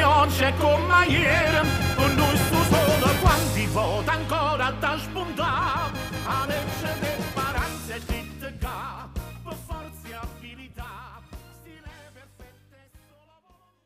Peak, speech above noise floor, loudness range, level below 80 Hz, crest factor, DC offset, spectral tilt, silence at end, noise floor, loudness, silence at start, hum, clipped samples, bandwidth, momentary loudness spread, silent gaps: -6 dBFS; 39 dB; 20 LU; -38 dBFS; 18 dB; under 0.1%; -5 dB/octave; 1.4 s; -61 dBFS; -23 LUFS; 0 s; none; under 0.1%; 15.5 kHz; 19 LU; none